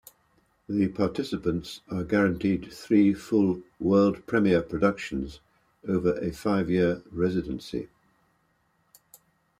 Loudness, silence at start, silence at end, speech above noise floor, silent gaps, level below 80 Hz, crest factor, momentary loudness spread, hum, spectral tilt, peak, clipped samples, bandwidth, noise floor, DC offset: -26 LUFS; 0.7 s; 1.75 s; 44 dB; none; -54 dBFS; 18 dB; 12 LU; none; -7.5 dB/octave; -10 dBFS; under 0.1%; 14.5 kHz; -70 dBFS; under 0.1%